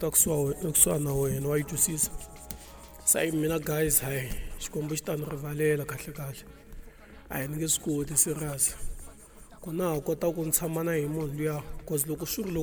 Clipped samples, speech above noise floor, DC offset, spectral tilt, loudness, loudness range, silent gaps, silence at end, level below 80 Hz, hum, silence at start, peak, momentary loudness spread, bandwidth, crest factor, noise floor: under 0.1%; 21 dB; under 0.1%; -4 dB/octave; -28 LUFS; 6 LU; none; 0 s; -46 dBFS; none; 0 s; -6 dBFS; 17 LU; over 20 kHz; 24 dB; -50 dBFS